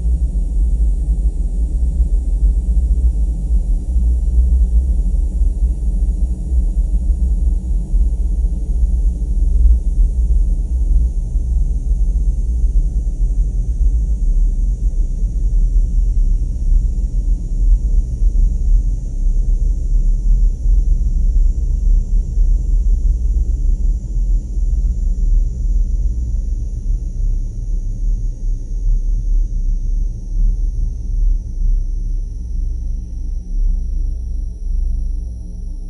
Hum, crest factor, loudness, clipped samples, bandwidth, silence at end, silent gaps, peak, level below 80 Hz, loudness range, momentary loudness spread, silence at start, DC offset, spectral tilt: none; 14 dB; -20 LUFS; under 0.1%; 6.2 kHz; 0 s; none; -2 dBFS; -14 dBFS; 5 LU; 7 LU; 0 s; under 0.1%; -9 dB/octave